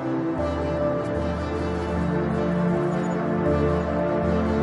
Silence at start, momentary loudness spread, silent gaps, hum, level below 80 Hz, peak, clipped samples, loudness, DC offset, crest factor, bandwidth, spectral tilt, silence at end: 0 s; 4 LU; none; none; -40 dBFS; -12 dBFS; under 0.1%; -24 LUFS; under 0.1%; 12 dB; 10.5 kHz; -8.5 dB/octave; 0 s